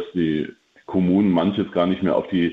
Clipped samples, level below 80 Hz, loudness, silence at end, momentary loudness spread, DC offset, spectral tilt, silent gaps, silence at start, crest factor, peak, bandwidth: under 0.1%; -52 dBFS; -21 LUFS; 0 s; 9 LU; under 0.1%; -9 dB/octave; none; 0 s; 14 dB; -6 dBFS; 4.8 kHz